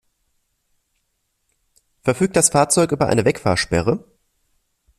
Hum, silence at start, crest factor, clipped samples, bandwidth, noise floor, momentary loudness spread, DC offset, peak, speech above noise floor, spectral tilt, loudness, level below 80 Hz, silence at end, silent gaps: none; 2.05 s; 20 dB; under 0.1%; 14.5 kHz; -71 dBFS; 8 LU; under 0.1%; 0 dBFS; 54 dB; -4 dB/octave; -18 LUFS; -48 dBFS; 1 s; none